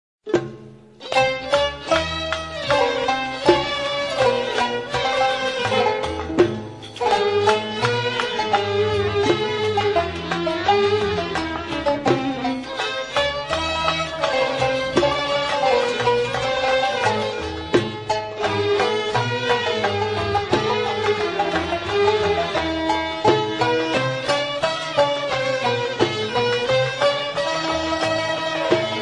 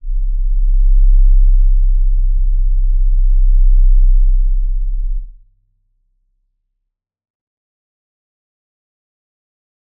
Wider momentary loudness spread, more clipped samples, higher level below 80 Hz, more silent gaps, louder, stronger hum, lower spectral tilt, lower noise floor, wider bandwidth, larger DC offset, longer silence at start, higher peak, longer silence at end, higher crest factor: second, 5 LU vs 9 LU; neither; second, -48 dBFS vs -12 dBFS; neither; second, -21 LUFS vs -17 LUFS; neither; second, -4.5 dB/octave vs -15.5 dB/octave; second, -42 dBFS vs -75 dBFS; first, 11 kHz vs 0.2 kHz; neither; first, 0.25 s vs 0.05 s; about the same, -2 dBFS vs -2 dBFS; second, 0 s vs 4.7 s; first, 20 dB vs 10 dB